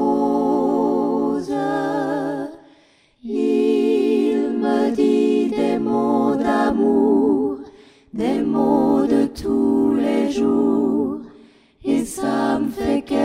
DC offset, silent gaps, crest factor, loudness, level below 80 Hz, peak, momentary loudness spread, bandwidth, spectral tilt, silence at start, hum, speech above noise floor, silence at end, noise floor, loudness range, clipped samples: under 0.1%; none; 14 dB; -19 LUFS; -50 dBFS; -4 dBFS; 7 LU; 13.5 kHz; -6.5 dB/octave; 0 s; none; 38 dB; 0 s; -55 dBFS; 3 LU; under 0.1%